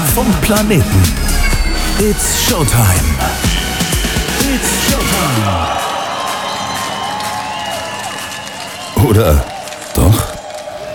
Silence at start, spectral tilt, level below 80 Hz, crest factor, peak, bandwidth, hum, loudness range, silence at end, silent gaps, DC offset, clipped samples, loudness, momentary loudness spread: 0 s; -4 dB/octave; -20 dBFS; 14 dB; 0 dBFS; 19 kHz; none; 5 LU; 0 s; none; under 0.1%; under 0.1%; -14 LUFS; 11 LU